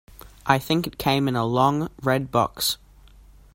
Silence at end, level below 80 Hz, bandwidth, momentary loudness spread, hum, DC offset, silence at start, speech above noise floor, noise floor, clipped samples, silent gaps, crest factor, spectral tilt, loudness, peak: 0.8 s; -50 dBFS; 16.5 kHz; 5 LU; none; under 0.1%; 0.1 s; 27 dB; -50 dBFS; under 0.1%; none; 24 dB; -5 dB/octave; -23 LUFS; 0 dBFS